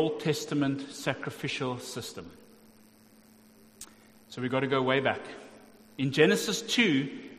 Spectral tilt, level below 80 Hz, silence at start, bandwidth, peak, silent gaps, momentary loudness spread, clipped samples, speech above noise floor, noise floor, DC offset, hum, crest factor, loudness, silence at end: -4.5 dB/octave; -70 dBFS; 0 s; 15.5 kHz; -6 dBFS; none; 23 LU; under 0.1%; 29 dB; -58 dBFS; under 0.1%; none; 24 dB; -29 LUFS; 0 s